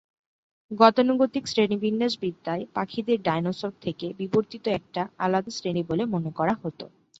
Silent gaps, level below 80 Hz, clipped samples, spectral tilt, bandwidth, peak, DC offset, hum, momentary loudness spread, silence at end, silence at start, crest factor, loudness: none; -64 dBFS; under 0.1%; -6 dB/octave; 8 kHz; -2 dBFS; under 0.1%; none; 12 LU; 0.35 s; 0.7 s; 24 dB; -26 LUFS